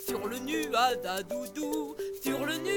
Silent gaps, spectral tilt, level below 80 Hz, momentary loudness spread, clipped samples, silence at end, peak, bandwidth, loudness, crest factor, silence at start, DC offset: none; -3 dB/octave; -64 dBFS; 8 LU; under 0.1%; 0 s; -14 dBFS; 19 kHz; -32 LUFS; 18 dB; 0 s; under 0.1%